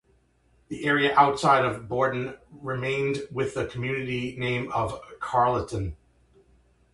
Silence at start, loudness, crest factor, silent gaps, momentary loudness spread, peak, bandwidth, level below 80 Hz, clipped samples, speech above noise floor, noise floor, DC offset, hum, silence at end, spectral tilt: 0.7 s; -26 LUFS; 22 dB; none; 14 LU; -6 dBFS; 11.5 kHz; -50 dBFS; under 0.1%; 39 dB; -64 dBFS; under 0.1%; none; 1 s; -5.5 dB/octave